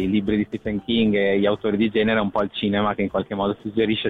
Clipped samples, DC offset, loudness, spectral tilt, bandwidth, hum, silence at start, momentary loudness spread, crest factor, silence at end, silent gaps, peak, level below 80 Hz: under 0.1%; under 0.1%; -22 LUFS; -8.5 dB/octave; 4.5 kHz; none; 0 s; 5 LU; 12 dB; 0 s; none; -10 dBFS; -48 dBFS